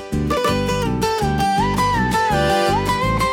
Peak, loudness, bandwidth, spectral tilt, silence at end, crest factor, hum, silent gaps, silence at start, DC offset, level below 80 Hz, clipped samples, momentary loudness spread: -6 dBFS; -18 LUFS; 18 kHz; -5 dB/octave; 0 s; 12 dB; none; none; 0 s; under 0.1%; -32 dBFS; under 0.1%; 3 LU